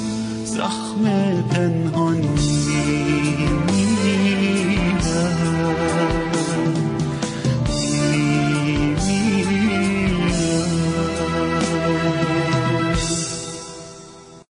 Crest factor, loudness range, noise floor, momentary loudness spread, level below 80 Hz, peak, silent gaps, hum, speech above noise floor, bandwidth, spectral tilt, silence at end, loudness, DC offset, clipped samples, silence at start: 12 dB; 2 LU; -41 dBFS; 5 LU; -36 dBFS; -6 dBFS; none; none; 23 dB; 10.5 kHz; -5.5 dB/octave; 0.15 s; -20 LUFS; under 0.1%; under 0.1%; 0 s